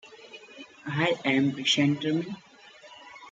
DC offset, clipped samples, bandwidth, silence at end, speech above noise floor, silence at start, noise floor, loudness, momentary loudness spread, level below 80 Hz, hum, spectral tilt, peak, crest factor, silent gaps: under 0.1%; under 0.1%; 9.2 kHz; 0 s; 25 dB; 0.05 s; -51 dBFS; -26 LUFS; 23 LU; -74 dBFS; none; -4.5 dB/octave; -10 dBFS; 18 dB; none